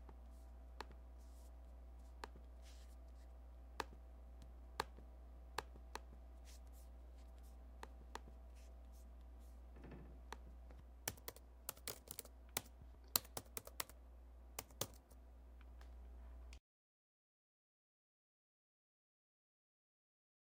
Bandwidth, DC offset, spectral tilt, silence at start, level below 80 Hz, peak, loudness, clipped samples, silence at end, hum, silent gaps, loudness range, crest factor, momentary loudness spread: 16 kHz; under 0.1%; -2.5 dB/octave; 0 s; -60 dBFS; -14 dBFS; -53 LUFS; under 0.1%; 3.85 s; none; none; 12 LU; 40 dB; 13 LU